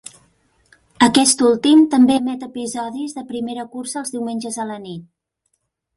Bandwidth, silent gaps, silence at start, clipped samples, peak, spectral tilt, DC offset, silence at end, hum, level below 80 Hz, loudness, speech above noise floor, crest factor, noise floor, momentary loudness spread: 11.5 kHz; none; 1 s; under 0.1%; 0 dBFS; -3 dB/octave; under 0.1%; 0.95 s; none; -60 dBFS; -17 LUFS; 54 dB; 18 dB; -71 dBFS; 15 LU